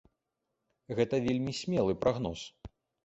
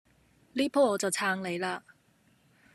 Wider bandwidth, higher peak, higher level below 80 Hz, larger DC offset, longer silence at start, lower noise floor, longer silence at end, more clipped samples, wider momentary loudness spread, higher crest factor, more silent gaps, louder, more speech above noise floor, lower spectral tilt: second, 8.2 kHz vs 13.5 kHz; about the same, -14 dBFS vs -14 dBFS; first, -56 dBFS vs -74 dBFS; neither; first, 0.9 s vs 0.55 s; first, -85 dBFS vs -66 dBFS; second, 0.4 s vs 0.95 s; neither; about the same, 11 LU vs 11 LU; about the same, 18 dB vs 18 dB; neither; about the same, -32 LUFS vs -30 LUFS; first, 54 dB vs 37 dB; first, -6 dB/octave vs -3.5 dB/octave